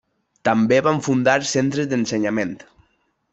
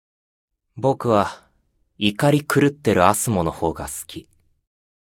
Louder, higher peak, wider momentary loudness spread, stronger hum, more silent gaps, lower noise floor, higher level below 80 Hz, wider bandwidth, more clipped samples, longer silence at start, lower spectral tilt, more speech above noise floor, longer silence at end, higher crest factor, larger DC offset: about the same, -20 LUFS vs -20 LUFS; about the same, -2 dBFS vs 0 dBFS; second, 8 LU vs 13 LU; neither; neither; about the same, -66 dBFS vs -65 dBFS; second, -60 dBFS vs -48 dBFS; second, 8.2 kHz vs 19 kHz; neither; second, 0.45 s vs 0.75 s; about the same, -5 dB/octave vs -5 dB/octave; about the same, 47 dB vs 45 dB; second, 0.75 s vs 1 s; about the same, 18 dB vs 22 dB; neither